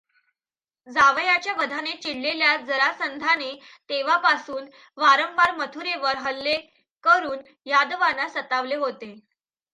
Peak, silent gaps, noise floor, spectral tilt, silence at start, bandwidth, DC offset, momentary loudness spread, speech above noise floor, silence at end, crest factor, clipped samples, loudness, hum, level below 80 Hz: -4 dBFS; 6.97-7.01 s; under -90 dBFS; -1.5 dB/octave; 0.85 s; 11 kHz; under 0.1%; 12 LU; over 67 dB; 0.55 s; 20 dB; under 0.1%; -22 LUFS; none; -68 dBFS